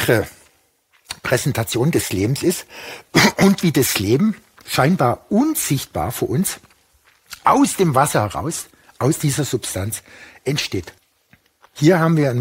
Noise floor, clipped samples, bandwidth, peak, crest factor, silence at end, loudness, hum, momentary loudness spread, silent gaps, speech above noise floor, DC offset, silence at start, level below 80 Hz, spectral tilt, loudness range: -60 dBFS; under 0.1%; 16.5 kHz; -2 dBFS; 18 dB; 0 s; -18 LUFS; none; 14 LU; none; 42 dB; under 0.1%; 0 s; -50 dBFS; -5 dB/octave; 4 LU